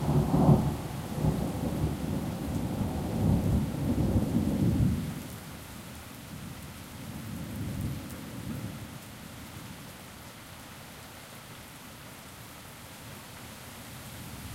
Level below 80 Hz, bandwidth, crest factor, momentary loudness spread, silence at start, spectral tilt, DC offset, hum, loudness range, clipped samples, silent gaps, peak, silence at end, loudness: -42 dBFS; 16 kHz; 22 dB; 18 LU; 0 s; -7 dB/octave; under 0.1%; none; 15 LU; under 0.1%; none; -10 dBFS; 0 s; -31 LUFS